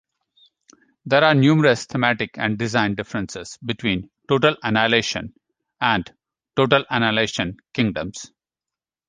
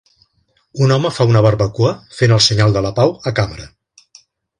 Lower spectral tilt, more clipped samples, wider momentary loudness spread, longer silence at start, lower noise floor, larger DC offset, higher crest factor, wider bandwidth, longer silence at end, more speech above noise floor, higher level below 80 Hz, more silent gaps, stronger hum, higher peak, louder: about the same, -5 dB/octave vs -5.5 dB/octave; neither; first, 15 LU vs 9 LU; first, 1.05 s vs 0.75 s; first, -89 dBFS vs -61 dBFS; neither; about the same, 20 dB vs 16 dB; about the same, 9.8 kHz vs 10.5 kHz; about the same, 0.85 s vs 0.9 s; first, 69 dB vs 47 dB; second, -52 dBFS vs -40 dBFS; neither; neither; about the same, -2 dBFS vs 0 dBFS; second, -20 LUFS vs -14 LUFS